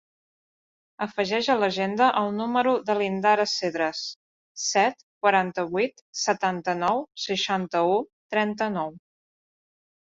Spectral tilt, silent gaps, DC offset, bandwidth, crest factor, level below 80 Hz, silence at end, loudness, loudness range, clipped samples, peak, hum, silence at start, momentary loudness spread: -3.5 dB/octave; 4.16-4.55 s, 5.03-5.21 s, 6.01-6.13 s, 8.13-8.30 s; under 0.1%; 7.8 kHz; 20 dB; -70 dBFS; 1.1 s; -25 LUFS; 3 LU; under 0.1%; -6 dBFS; none; 1 s; 7 LU